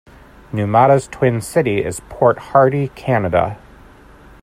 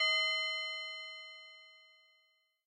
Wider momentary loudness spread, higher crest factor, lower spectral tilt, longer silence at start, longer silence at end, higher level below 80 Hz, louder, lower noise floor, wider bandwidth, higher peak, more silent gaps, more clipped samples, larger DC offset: second, 11 LU vs 22 LU; about the same, 16 dB vs 18 dB; first, -7 dB/octave vs 8 dB/octave; first, 0.5 s vs 0 s; about the same, 0.85 s vs 0.9 s; first, -46 dBFS vs under -90 dBFS; first, -16 LUFS vs -35 LUFS; second, -43 dBFS vs -75 dBFS; first, 15 kHz vs 10.5 kHz; first, 0 dBFS vs -22 dBFS; neither; neither; neither